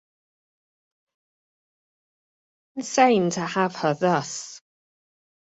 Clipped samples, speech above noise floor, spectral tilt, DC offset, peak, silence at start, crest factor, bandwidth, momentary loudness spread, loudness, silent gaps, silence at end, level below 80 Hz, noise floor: under 0.1%; over 68 dB; -4.5 dB/octave; under 0.1%; -4 dBFS; 2.75 s; 24 dB; 8.4 kHz; 16 LU; -22 LUFS; none; 0.9 s; -72 dBFS; under -90 dBFS